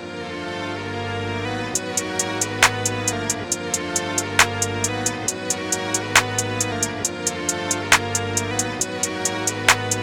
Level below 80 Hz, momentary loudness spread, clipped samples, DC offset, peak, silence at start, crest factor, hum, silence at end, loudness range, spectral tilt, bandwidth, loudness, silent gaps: -50 dBFS; 9 LU; under 0.1%; under 0.1%; 0 dBFS; 0 s; 22 dB; none; 0 s; 2 LU; -2 dB/octave; over 20 kHz; -21 LUFS; none